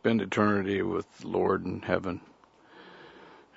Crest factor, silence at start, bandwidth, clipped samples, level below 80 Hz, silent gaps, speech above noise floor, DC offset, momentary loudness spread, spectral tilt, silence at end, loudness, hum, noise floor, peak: 22 dB; 0.05 s; 8 kHz; under 0.1%; -66 dBFS; none; 27 dB; under 0.1%; 24 LU; -7 dB/octave; 0.2 s; -29 LUFS; none; -55 dBFS; -8 dBFS